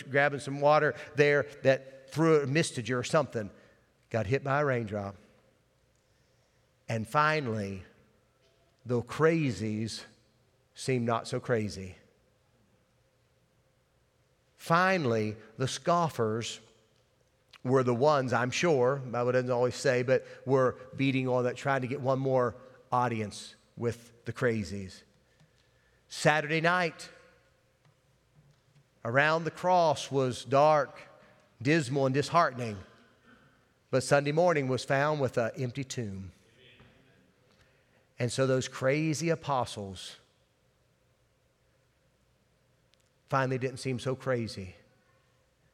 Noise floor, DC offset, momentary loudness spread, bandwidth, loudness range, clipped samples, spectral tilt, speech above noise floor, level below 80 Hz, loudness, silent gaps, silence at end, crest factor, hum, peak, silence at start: -70 dBFS; under 0.1%; 14 LU; 14.5 kHz; 8 LU; under 0.1%; -5.5 dB/octave; 41 dB; -72 dBFS; -29 LUFS; none; 1 s; 22 dB; none; -8 dBFS; 0 s